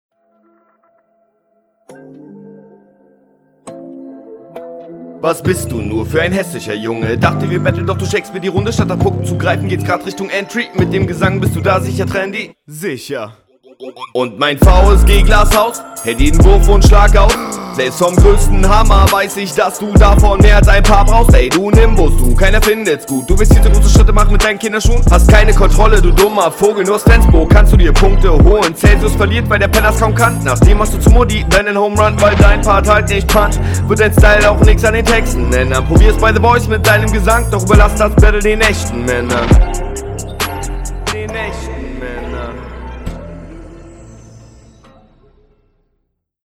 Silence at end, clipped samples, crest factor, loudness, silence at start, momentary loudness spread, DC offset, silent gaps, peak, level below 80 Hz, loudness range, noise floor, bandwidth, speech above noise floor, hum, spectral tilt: 2.6 s; 2%; 10 dB; -11 LUFS; 2.35 s; 15 LU; under 0.1%; none; 0 dBFS; -12 dBFS; 10 LU; -67 dBFS; 16.5 kHz; 58 dB; none; -5.5 dB/octave